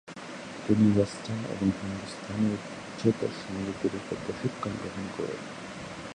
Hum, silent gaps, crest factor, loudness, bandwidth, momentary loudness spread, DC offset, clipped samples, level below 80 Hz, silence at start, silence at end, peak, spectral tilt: none; none; 20 dB; -31 LUFS; 10.5 kHz; 15 LU; under 0.1%; under 0.1%; -56 dBFS; 0.05 s; 0 s; -10 dBFS; -6.5 dB/octave